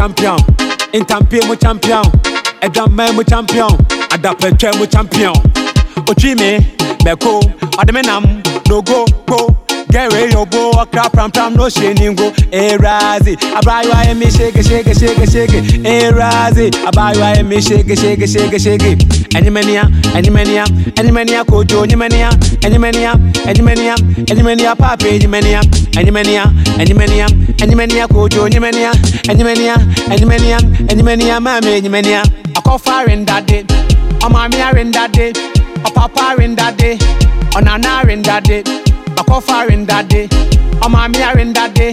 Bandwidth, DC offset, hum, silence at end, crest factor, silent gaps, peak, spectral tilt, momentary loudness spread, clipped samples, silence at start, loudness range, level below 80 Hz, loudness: 15.5 kHz; under 0.1%; none; 0 s; 8 dB; none; 0 dBFS; -5.5 dB/octave; 3 LU; under 0.1%; 0 s; 2 LU; -14 dBFS; -10 LUFS